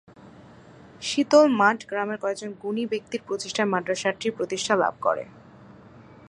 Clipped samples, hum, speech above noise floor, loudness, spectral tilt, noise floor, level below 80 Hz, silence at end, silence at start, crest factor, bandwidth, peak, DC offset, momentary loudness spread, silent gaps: under 0.1%; none; 25 dB; -24 LUFS; -4 dB/octave; -48 dBFS; -66 dBFS; 0.6 s; 0.2 s; 22 dB; 11 kHz; -4 dBFS; under 0.1%; 13 LU; none